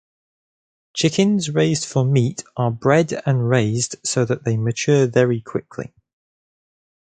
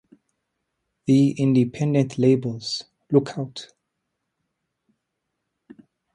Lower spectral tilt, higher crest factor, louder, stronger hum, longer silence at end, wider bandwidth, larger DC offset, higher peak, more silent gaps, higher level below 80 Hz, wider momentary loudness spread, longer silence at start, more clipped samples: second, -5.5 dB/octave vs -7 dB/octave; about the same, 18 dB vs 20 dB; first, -19 LUFS vs -22 LUFS; neither; second, 1.3 s vs 2.5 s; second, 9.4 kHz vs 11 kHz; neither; about the same, -2 dBFS vs -4 dBFS; neither; first, -56 dBFS vs -64 dBFS; second, 10 LU vs 13 LU; about the same, 0.95 s vs 1.05 s; neither